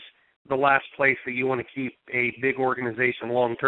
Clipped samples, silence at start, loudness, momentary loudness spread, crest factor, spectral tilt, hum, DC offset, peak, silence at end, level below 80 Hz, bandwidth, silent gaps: under 0.1%; 0 s; -24 LUFS; 8 LU; 20 dB; -8 dB/octave; none; under 0.1%; -6 dBFS; 0 s; -66 dBFS; 4.1 kHz; 0.36-0.45 s